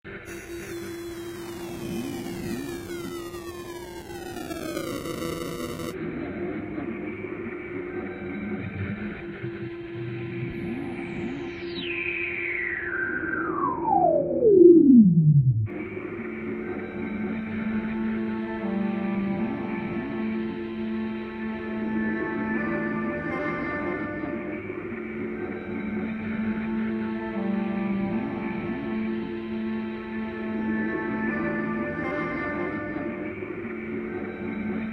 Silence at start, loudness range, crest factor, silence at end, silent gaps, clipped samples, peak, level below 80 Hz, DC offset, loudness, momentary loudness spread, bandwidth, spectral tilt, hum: 0.05 s; 14 LU; 22 dB; 0 s; none; under 0.1%; -4 dBFS; -54 dBFS; under 0.1%; -27 LUFS; 10 LU; 16 kHz; -7.5 dB/octave; none